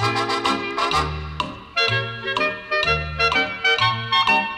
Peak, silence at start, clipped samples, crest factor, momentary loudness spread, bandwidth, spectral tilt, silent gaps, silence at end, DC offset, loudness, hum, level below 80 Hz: -8 dBFS; 0 s; under 0.1%; 14 dB; 7 LU; 15.5 kHz; -4 dB/octave; none; 0 s; under 0.1%; -20 LUFS; none; -40 dBFS